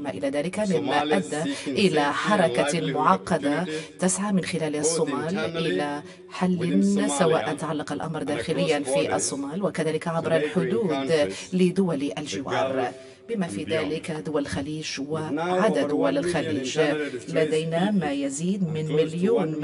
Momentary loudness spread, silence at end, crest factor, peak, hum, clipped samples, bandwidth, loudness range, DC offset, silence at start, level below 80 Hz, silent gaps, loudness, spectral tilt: 7 LU; 0 s; 20 dB; -6 dBFS; none; under 0.1%; 11.5 kHz; 3 LU; under 0.1%; 0 s; -60 dBFS; none; -25 LUFS; -5 dB/octave